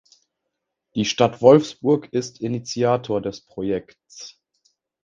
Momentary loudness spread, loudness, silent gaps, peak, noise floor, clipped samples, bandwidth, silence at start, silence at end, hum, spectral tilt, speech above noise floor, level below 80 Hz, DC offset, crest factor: 21 LU; -21 LUFS; none; 0 dBFS; -80 dBFS; under 0.1%; 7.6 kHz; 0.95 s; 0.75 s; none; -5.5 dB/octave; 59 dB; -58 dBFS; under 0.1%; 22 dB